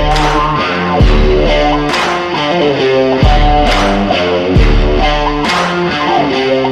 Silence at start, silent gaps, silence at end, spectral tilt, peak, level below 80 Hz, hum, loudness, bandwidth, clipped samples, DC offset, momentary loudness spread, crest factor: 0 s; none; 0 s; -5.5 dB/octave; 0 dBFS; -16 dBFS; none; -11 LUFS; 10.5 kHz; under 0.1%; under 0.1%; 3 LU; 10 dB